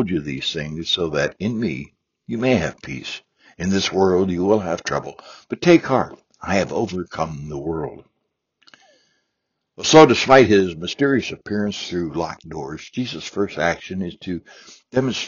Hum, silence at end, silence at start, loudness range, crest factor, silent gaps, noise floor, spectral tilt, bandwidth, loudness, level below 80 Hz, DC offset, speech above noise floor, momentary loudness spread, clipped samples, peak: none; 0 s; 0 s; 10 LU; 20 dB; none; -77 dBFS; -4 dB/octave; 7.2 kHz; -20 LUFS; -50 dBFS; under 0.1%; 57 dB; 18 LU; under 0.1%; 0 dBFS